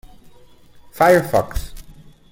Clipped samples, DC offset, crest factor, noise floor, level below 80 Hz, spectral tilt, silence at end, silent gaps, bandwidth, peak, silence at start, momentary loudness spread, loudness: under 0.1%; under 0.1%; 20 dB; -45 dBFS; -36 dBFS; -5.5 dB/octave; 0.4 s; none; 17 kHz; -2 dBFS; 0.95 s; 18 LU; -16 LUFS